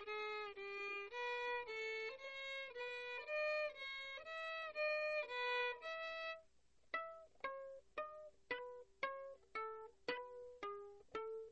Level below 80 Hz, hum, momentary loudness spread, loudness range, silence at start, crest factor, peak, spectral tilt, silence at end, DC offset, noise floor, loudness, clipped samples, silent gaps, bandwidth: -80 dBFS; none; 11 LU; 7 LU; 0 s; 18 dB; -30 dBFS; -2 dB/octave; 0 s; under 0.1%; -77 dBFS; -46 LUFS; under 0.1%; none; 8.2 kHz